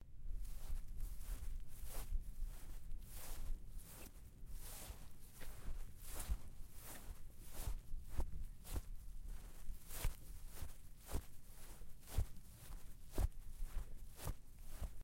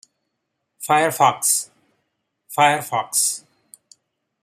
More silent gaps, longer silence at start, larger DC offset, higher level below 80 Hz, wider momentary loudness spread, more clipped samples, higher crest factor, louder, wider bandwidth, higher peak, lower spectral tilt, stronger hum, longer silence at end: neither; second, 0 s vs 0.8 s; neither; first, -48 dBFS vs -72 dBFS; second, 11 LU vs 15 LU; neither; about the same, 18 dB vs 22 dB; second, -53 LUFS vs -18 LUFS; about the same, 16.5 kHz vs 15.5 kHz; second, -26 dBFS vs -2 dBFS; first, -4.5 dB/octave vs -1.5 dB/octave; neither; second, 0 s vs 1.05 s